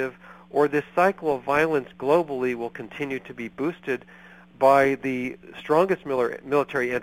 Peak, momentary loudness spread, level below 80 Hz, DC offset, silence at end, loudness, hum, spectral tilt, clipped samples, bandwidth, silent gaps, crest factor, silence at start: -4 dBFS; 12 LU; -62 dBFS; under 0.1%; 0 s; -24 LUFS; none; -6.5 dB/octave; under 0.1%; 16.5 kHz; none; 20 dB; 0 s